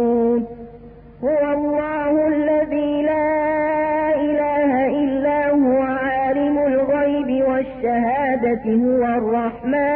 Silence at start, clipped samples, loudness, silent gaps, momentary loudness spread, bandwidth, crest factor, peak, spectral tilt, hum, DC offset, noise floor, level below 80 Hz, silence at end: 0 s; under 0.1%; -19 LUFS; none; 4 LU; 3.6 kHz; 10 dB; -10 dBFS; -11.5 dB/octave; none; under 0.1%; -41 dBFS; -46 dBFS; 0 s